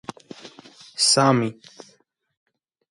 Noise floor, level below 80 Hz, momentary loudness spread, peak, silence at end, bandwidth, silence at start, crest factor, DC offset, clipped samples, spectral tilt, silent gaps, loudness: -48 dBFS; -68 dBFS; 26 LU; -4 dBFS; 1.4 s; 11.5 kHz; 0.45 s; 22 dB; under 0.1%; under 0.1%; -3.5 dB/octave; none; -19 LUFS